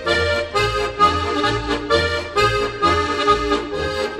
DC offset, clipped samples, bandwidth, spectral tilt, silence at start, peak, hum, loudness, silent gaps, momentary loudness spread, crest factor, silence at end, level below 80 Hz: under 0.1%; under 0.1%; 13 kHz; -4.5 dB/octave; 0 s; -2 dBFS; none; -18 LUFS; none; 5 LU; 16 dB; 0 s; -34 dBFS